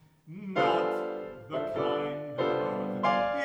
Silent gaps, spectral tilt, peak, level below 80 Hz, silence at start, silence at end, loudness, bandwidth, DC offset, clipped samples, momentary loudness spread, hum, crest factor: none; -6.5 dB/octave; -14 dBFS; -66 dBFS; 0.25 s; 0 s; -30 LUFS; over 20 kHz; under 0.1%; under 0.1%; 10 LU; none; 16 dB